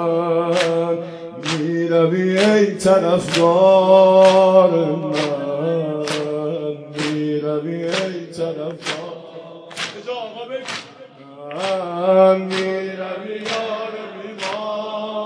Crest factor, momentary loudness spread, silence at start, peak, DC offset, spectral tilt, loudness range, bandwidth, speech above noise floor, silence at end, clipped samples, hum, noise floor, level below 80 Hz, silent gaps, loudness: 16 dB; 17 LU; 0 s; -2 dBFS; under 0.1%; -5.5 dB/octave; 13 LU; 10.5 kHz; 27 dB; 0 s; under 0.1%; none; -41 dBFS; -64 dBFS; none; -18 LUFS